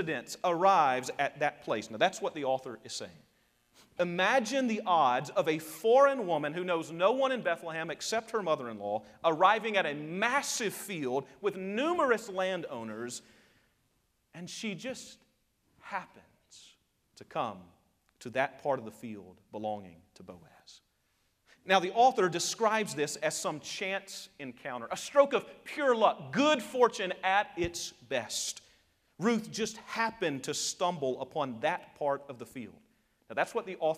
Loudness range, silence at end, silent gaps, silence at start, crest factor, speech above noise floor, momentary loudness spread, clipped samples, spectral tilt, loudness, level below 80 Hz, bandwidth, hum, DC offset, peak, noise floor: 13 LU; 0 s; none; 0 s; 22 dB; 43 dB; 15 LU; under 0.1%; -3.5 dB/octave; -31 LUFS; -70 dBFS; 15.5 kHz; none; under 0.1%; -10 dBFS; -75 dBFS